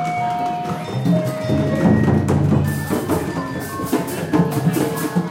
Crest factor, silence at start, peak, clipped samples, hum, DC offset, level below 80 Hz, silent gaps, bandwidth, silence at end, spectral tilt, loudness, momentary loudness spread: 16 dB; 0 s; -4 dBFS; under 0.1%; none; under 0.1%; -46 dBFS; none; 16.5 kHz; 0 s; -7 dB/octave; -19 LUFS; 8 LU